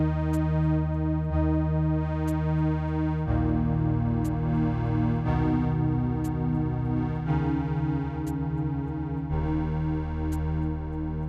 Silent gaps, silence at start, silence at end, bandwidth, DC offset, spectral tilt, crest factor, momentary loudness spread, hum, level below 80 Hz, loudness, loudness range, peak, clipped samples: none; 0 s; 0 s; 8.4 kHz; under 0.1%; -9.5 dB/octave; 12 dB; 5 LU; none; -34 dBFS; -27 LUFS; 3 LU; -14 dBFS; under 0.1%